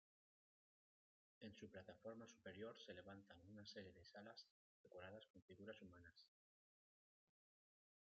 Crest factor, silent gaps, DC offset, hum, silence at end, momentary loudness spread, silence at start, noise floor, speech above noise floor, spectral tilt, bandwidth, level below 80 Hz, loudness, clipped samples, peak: 20 dB; 4.51-4.84 s, 5.30-5.34 s, 5.42-5.48 s; under 0.1%; none; 1.9 s; 7 LU; 1.4 s; under -90 dBFS; over 29 dB; -3.5 dB/octave; 7 kHz; under -90 dBFS; -61 LUFS; under 0.1%; -44 dBFS